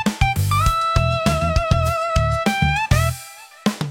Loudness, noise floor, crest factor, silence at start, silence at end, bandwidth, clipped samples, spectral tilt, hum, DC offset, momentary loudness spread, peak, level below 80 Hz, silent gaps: -19 LUFS; -39 dBFS; 16 dB; 0 s; 0 s; 17 kHz; under 0.1%; -5.5 dB/octave; none; under 0.1%; 7 LU; -4 dBFS; -28 dBFS; none